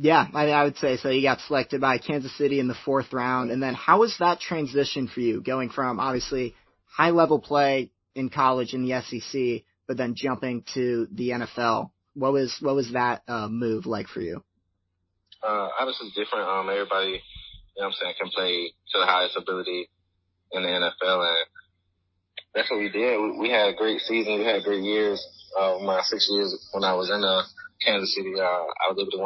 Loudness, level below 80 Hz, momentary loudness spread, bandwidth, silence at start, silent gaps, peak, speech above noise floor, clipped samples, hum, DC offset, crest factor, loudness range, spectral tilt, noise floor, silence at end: -25 LUFS; -60 dBFS; 10 LU; 6.2 kHz; 0 s; none; -4 dBFS; 51 dB; under 0.1%; none; under 0.1%; 22 dB; 5 LU; -5 dB/octave; -76 dBFS; 0 s